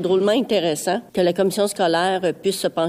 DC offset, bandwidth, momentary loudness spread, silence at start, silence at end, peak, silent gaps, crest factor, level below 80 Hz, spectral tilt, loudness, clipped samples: under 0.1%; 16 kHz; 4 LU; 0 s; 0 s; -8 dBFS; none; 12 dB; -64 dBFS; -4.5 dB/octave; -20 LUFS; under 0.1%